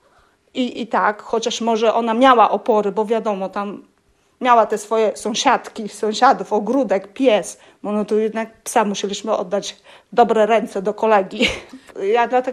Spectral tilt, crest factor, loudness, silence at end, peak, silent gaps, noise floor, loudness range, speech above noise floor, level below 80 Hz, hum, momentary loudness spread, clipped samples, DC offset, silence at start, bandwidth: -4 dB/octave; 16 dB; -18 LUFS; 0 s; -2 dBFS; none; -60 dBFS; 3 LU; 42 dB; -56 dBFS; none; 11 LU; under 0.1%; under 0.1%; 0.55 s; 13.5 kHz